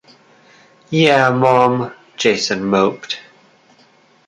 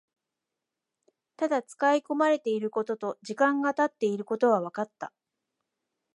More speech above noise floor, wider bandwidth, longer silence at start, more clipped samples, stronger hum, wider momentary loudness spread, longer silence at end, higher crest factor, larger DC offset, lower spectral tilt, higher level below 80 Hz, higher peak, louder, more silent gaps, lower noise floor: second, 37 dB vs 60 dB; about the same, 10.5 kHz vs 11.5 kHz; second, 0.9 s vs 1.4 s; neither; neither; first, 14 LU vs 10 LU; about the same, 1.1 s vs 1.05 s; about the same, 16 dB vs 18 dB; neither; about the same, -5 dB/octave vs -5.5 dB/octave; first, -58 dBFS vs -84 dBFS; first, 0 dBFS vs -10 dBFS; first, -15 LUFS vs -28 LUFS; neither; second, -52 dBFS vs -87 dBFS